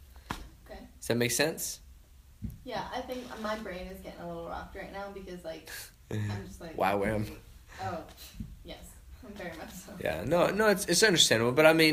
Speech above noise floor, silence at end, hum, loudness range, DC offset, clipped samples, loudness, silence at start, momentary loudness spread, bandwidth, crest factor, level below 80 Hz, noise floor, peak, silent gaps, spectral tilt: 25 dB; 0 s; none; 12 LU; under 0.1%; under 0.1%; -29 LUFS; 0 s; 24 LU; 15.5 kHz; 24 dB; -52 dBFS; -55 dBFS; -8 dBFS; none; -3.5 dB/octave